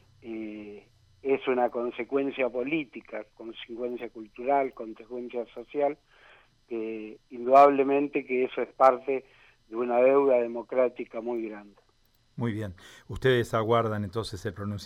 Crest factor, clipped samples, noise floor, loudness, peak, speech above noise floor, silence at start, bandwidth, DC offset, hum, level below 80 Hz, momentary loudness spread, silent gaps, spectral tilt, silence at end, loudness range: 20 dB; under 0.1%; -66 dBFS; -27 LUFS; -8 dBFS; 39 dB; 0.25 s; 13.5 kHz; under 0.1%; none; -60 dBFS; 18 LU; none; -7 dB/octave; 0 s; 8 LU